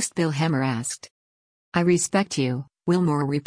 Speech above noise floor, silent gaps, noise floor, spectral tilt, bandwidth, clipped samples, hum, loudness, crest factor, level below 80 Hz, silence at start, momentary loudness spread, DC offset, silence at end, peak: over 67 dB; 1.11-1.72 s; under -90 dBFS; -5 dB/octave; 10.5 kHz; under 0.1%; none; -24 LUFS; 16 dB; -62 dBFS; 0 s; 8 LU; under 0.1%; 0.05 s; -8 dBFS